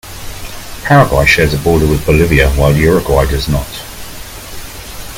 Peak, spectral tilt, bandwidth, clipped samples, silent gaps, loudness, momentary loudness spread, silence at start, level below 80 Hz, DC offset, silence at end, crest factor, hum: 0 dBFS; -5.5 dB/octave; 17 kHz; 0.1%; none; -10 LUFS; 19 LU; 0.05 s; -22 dBFS; under 0.1%; 0 s; 12 dB; none